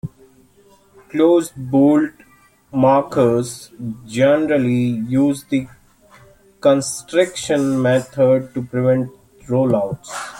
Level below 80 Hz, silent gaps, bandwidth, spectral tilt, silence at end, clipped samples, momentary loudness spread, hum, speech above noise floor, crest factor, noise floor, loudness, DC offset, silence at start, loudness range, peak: -54 dBFS; none; 16.5 kHz; -6 dB/octave; 0 s; under 0.1%; 12 LU; none; 35 dB; 16 dB; -52 dBFS; -17 LUFS; under 0.1%; 0.05 s; 2 LU; -2 dBFS